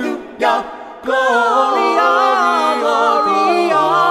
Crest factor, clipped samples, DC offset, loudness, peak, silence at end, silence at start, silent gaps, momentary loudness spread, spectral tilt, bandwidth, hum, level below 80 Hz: 12 dB; under 0.1%; under 0.1%; -14 LUFS; -2 dBFS; 0 s; 0 s; none; 7 LU; -3.5 dB/octave; 14.5 kHz; none; -60 dBFS